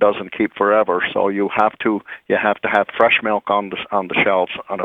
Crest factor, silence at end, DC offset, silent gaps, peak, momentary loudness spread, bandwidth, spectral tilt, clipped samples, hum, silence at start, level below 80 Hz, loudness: 18 dB; 0 s; under 0.1%; none; 0 dBFS; 7 LU; 4.4 kHz; -7 dB/octave; under 0.1%; none; 0 s; -58 dBFS; -18 LUFS